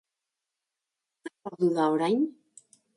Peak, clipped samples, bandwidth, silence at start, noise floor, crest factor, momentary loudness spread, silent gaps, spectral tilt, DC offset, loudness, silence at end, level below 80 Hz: -12 dBFS; under 0.1%; 11.5 kHz; 1.25 s; -87 dBFS; 18 dB; 20 LU; none; -6.5 dB/octave; under 0.1%; -27 LUFS; 0.65 s; -78 dBFS